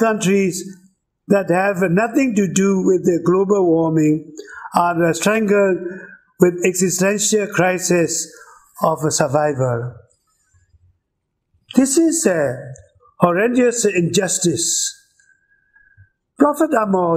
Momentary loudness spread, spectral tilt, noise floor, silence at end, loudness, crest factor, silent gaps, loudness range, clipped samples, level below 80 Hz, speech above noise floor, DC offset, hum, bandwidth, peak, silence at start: 8 LU; -4.5 dB/octave; -74 dBFS; 0 s; -17 LUFS; 18 dB; none; 4 LU; under 0.1%; -58 dBFS; 58 dB; under 0.1%; none; 15.5 kHz; 0 dBFS; 0 s